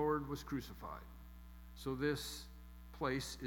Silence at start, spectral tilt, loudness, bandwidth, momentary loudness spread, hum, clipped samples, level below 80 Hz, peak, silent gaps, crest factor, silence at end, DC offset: 0 s; -5 dB/octave; -43 LUFS; 18 kHz; 18 LU; none; under 0.1%; -56 dBFS; -24 dBFS; none; 18 dB; 0 s; under 0.1%